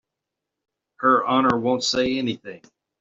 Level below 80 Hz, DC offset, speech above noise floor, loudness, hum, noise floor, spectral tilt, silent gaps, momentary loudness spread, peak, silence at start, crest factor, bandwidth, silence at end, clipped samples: -60 dBFS; under 0.1%; 63 dB; -21 LUFS; none; -84 dBFS; -3 dB/octave; none; 12 LU; -2 dBFS; 1 s; 20 dB; 8 kHz; 0.45 s; under 0.1%